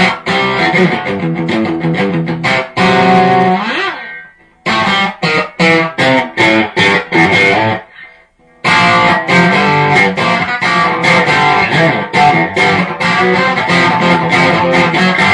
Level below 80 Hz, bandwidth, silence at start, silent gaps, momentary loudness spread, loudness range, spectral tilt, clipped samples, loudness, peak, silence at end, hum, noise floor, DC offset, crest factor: -46 dBFS; 10.5 kHz; 0 s; none; 7 LU; 3 LU; -5 dB/octave; under 0.1%; -10 LUFS; 0 dBFS; 0 s; none; -45 dBFS; under 0.1%; 10 dB